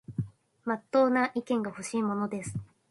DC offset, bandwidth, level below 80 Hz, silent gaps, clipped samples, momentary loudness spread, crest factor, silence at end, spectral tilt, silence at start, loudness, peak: under 0.1%; 11.5 kHz; -62 dBFS; none; under 0.1%; 14 LU; 18 dB; 0.25 s; -6 dB/octave; 0.1 s; -30 LUFS; -12 dBFS